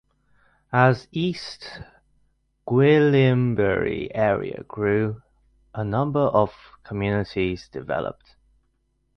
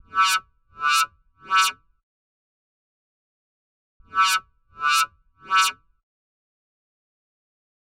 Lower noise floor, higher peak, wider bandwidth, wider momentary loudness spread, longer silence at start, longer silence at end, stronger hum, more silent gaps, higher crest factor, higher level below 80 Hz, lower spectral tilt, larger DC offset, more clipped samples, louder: second, -69 dBFS vs under -90 dBFS; first, -4 dBFS vs -8 dBFS; second, 9 kHz vs 16 kHz; first, 17 LU vs 7 LU; first, 0.7 s vs 0.15 s; second, 1.05 s vs 2.25 s; neither; second, none vs 2.03-4.00 s; about the same, 20 dB vs 18 dB; first, -50 dBFS vs -66 dBFS; first, -8 dB/octave vs 3 dB/octave; neither; neither; about the same, -22 LUFS vs -21 LUFS